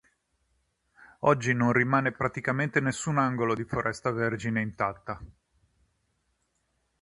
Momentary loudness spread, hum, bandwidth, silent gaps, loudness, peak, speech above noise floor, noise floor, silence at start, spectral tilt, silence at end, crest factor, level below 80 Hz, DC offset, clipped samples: 7 LU; none; 11 kHz; none; -27 LUFS; -8 dBFS; 48 dB; -75 dBFS; 1 s; -6 dB/octave; 1.75 s; 22 dB; -58 dBFS; under 0.1%; under 0.1%